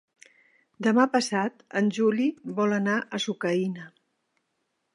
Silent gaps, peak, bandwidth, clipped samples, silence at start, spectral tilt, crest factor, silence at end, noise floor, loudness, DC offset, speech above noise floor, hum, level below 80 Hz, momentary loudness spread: none; -6 dBFS; 11.5 kHz; under 0.1%; 0.8 s; -5 dB/octave; 20 dB; 1.05 s; -77 dBFS; -26 LUFS; under 0.1%; 52 dB; none; -80 dBFS; 7 LU